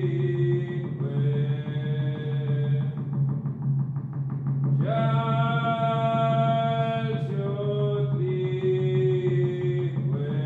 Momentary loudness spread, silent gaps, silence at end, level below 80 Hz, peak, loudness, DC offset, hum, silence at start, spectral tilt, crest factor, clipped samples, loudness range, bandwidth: 5 LU; none; 0 s; -66 dBFS; -12 dBFS; -26 LUFS; under 0.1%; none; 0 s; -10 dB/octave; 12 dB; under 0.1%; 3 LU; 4 kHz